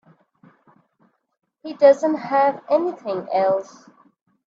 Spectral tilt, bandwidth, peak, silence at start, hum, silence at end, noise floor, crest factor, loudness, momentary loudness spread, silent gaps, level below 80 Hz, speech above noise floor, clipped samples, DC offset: -6 dB/octave; 7.4 kHz; -2 dBFS; 1.65 s; none; 0.85 s; -74 dBFS; 20 dB; -19 LUFS; 13 LU; none; -74 dBFS; 55 dB; under 0.1%; under 0.1%